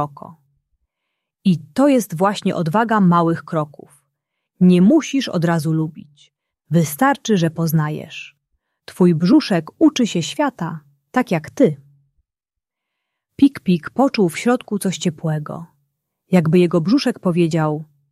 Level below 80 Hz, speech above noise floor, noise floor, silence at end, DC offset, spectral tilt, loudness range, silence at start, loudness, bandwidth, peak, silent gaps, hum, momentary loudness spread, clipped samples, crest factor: -62 dBFS; 68 dB; -85 dBFS; 0.25 s; under 0.1%; -6.5 dB/octave; 4 LU; 0 s; -18 LUFS; 14 kHz; -2 dBFS; none; none; 11 LU; under 0.1%; 16 dB